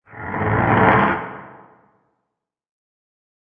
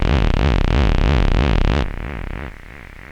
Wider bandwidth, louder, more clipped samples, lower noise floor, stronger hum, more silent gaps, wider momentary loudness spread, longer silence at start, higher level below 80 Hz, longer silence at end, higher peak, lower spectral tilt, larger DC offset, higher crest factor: second, 4.6 kHz vs 8 kHz; about the same, -17 LUFS vs -19 LUFS; neither; first, -80 dBFS vs -37 dBFS; neither; neither; about the same, 18 LU vs 18 LU; about the same, 0.1 s vs 0 s; second, -44 dBFS vs -18 dBFS; first, 1.95 s vs 0 s; about the same, -2 dBFS vs -4 dBFS; first, -10 dB/octave vs -7 dB/octave; neither; first, 20 dB vs 14 dB